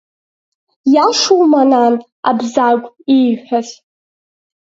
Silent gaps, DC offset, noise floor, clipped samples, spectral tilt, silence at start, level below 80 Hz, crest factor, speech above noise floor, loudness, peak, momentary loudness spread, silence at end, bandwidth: 2.12-2.23 s; under 0.1%; under -90 dBFS; under 0.1%; -3.5 dB/octave; 0.85 s; -68 dBFS; 14 dB; over 78 dB; -13 LUFS; 0 dBFS; 9 LU; 0.95 s; 8 kHz